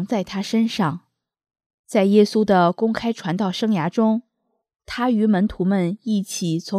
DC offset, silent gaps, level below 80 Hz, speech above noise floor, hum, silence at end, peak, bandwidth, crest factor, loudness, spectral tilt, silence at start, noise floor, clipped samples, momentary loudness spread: under 0.1%; 1.66-1.84 s; -54 dBFS; 54 dB; none; 0 s; -2 dBFS; 13.5 kHz; 18 dB; -20 LUFS; -6 dB/octave; 0 s; -74 dBFS; under 0.1%; 8 LU